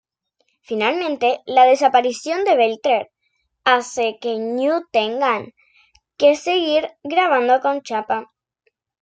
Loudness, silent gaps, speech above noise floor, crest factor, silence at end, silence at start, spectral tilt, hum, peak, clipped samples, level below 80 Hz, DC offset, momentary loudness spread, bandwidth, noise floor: -18 LUFS; none; 52 dB; 16 dB; 0.8 s; 0.7 s; -3 dB/octave; none; -2 dBFS; under 0.1%; -68 dBFS; under 0.1%; 8 LU; 9.2 kHz; -70 dBFS